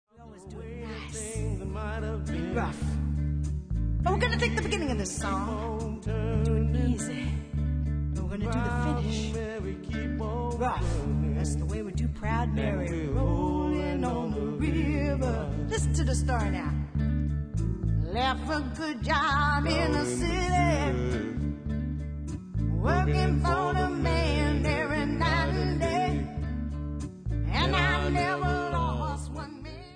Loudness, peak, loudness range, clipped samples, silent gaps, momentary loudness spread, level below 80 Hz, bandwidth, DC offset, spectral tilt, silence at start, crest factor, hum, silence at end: -29 LUFS; -10 dBFS; 4 LU; under 0.1%; none; 8 LU; -34 dBFS; 10 kHz; under 0.1%; -6 dB/octave; 0.15 s; 18 dB; none; 0 s